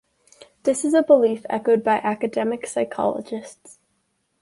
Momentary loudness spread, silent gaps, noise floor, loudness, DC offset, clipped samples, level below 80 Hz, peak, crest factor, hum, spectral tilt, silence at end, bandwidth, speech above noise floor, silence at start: 13 LU; none; -70 dBFS; -21 LUFS; under 0.1%; under 0.1%; -68 dBFS; -4 dBFS; 18 dB; none; -5 dB/octave; 0.9 s; 11.5 kHz; 50 dB; 0.65 s